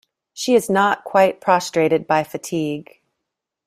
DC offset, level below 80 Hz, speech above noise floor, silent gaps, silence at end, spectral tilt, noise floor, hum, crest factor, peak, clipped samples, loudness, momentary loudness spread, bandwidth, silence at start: under 0.1%; -64 dBFS; 63 dB; none; 0.85 s; -4.5 dB/octave; -81 dBFS; none; 18 dB; -2 dBFS; under 0.1%; -19 LUFS; 10 LU; 16 kHz; 0.35 s